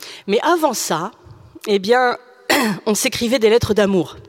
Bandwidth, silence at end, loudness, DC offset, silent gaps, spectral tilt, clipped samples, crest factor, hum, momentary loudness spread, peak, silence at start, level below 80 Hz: 16.5 kHz; 0.1 s; -17 LUFS; under 0.1%; none; -3.5 dB/octave; under 0.1%; 16 dB; none; 8 LU; -2 dBFS; 0 s; -48 dBFS